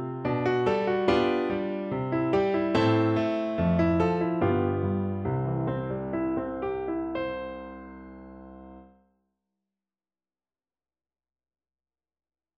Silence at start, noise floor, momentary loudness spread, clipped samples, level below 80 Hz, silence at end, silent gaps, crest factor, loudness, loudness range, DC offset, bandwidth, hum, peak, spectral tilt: 0 s; under -90 dBFS; 19 LU; under 0.1%; -52 dBFS; 3.75 s; none; 18 dB; -27 LUFS; 12 LU; under 0.1%; 7.8 kHz; none; -10 dBFS; -8.5 dB/octave